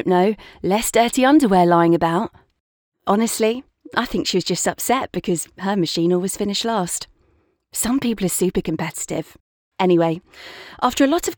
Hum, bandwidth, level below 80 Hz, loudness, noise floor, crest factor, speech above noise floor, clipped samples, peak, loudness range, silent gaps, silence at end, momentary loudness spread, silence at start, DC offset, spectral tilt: none; over 20 kHz; -48 dBFS; -19 LUFS; -62 dBFS; 18 dB; 43 dB; under 0.1%; -2 dBFS; 5 LU; 2.60-2.92 s, 9.40-9.71 s; 0 s; 14 LU; 0 s; under 0.1%; -4.5 dB/octave